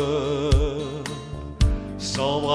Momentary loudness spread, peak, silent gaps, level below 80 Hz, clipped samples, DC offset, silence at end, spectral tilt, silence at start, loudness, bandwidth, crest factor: 10 LU; -8 dBFS; none; -28 dBFS; under 0.1%; under 0.1%; 0 s; -5.5 dB/octave; 0 s; -25 LUFS; 11 kHz; 16 dB